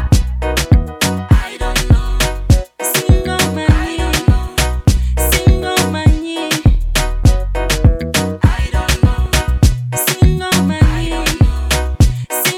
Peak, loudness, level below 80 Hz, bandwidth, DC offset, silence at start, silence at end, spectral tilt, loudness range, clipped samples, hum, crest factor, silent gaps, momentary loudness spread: 0 dBFS; -14 LUFS; -16 dBFS; 19 kHz; under 0.1%; 0 s; 0 s; -4.5 dB/octave; 1 LU; under 0.1%; none; 12 dB; none; 5 LU